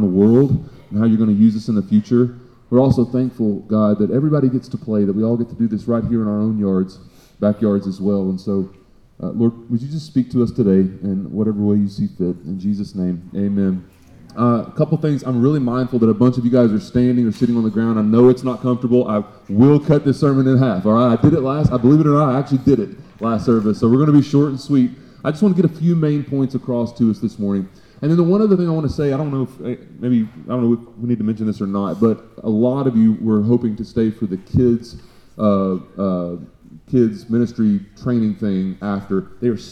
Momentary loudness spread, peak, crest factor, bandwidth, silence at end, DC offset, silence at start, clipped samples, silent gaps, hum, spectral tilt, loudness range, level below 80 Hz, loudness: 9 LU; -2 dBFS; 14 dB; 8.8 kHz; 0 s; under 0.1%; 0 s; under 0.1%; none; none; -9.5 dB/octave; 5 LU; -46 dBFS; -17 LUFS